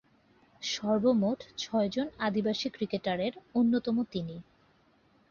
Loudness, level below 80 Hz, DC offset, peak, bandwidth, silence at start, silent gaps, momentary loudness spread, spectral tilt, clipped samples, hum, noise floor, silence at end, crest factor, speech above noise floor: -31 LUFS; -66 dBFS; under 0.1%; -14 dBFS; 7.2 kHz; 0.6 s; none; 10 LU; -5.5 dB/octave; under 0.1%; none; -66 dBFS; 0.9 s; 16 dB; 36 dB